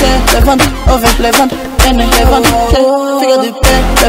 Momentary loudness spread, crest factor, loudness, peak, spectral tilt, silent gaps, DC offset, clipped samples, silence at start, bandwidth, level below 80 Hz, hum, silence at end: 3 LU; 8 dB; -9 LUFS; 0 dBFS; -4 dB/octave; none; under 0.1%; 0.7%; 0 s; 16.5 kHz; -14 dBFS; none; 0 s